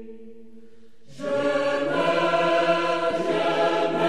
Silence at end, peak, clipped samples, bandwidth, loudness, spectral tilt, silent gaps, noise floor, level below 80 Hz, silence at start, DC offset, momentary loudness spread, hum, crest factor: 0 s; -8 dBFS; under 0.1%; 11.5 kHz; -23 LUFS; -5 dB/octave; none; -54 dBFS; -64 dBFS; 0 s; 0.9%; 6 LU; none; 14 dB